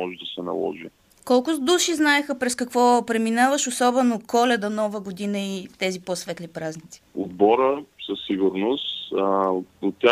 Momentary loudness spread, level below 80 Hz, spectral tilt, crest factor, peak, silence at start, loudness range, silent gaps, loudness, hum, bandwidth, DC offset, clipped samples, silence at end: 13 LU; -66 dBFS; -3.5 dB/octave; 18 dB; -4 dBFS; 0 s; 5 LU; none; -23 LUFS; none; 15.5 kHz; under 0.1%; under 0.1%; 0 s